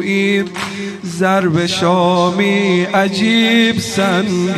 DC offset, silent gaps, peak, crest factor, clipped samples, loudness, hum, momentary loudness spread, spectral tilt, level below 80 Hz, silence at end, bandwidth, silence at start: under 0.1%; none; -2 dBFS; 12 dB; under 0.1%; -14 LUFS; none; 10 LU; -5 dB/octave; -54 dBFS; 0 s; 13.5 kHz; 0 s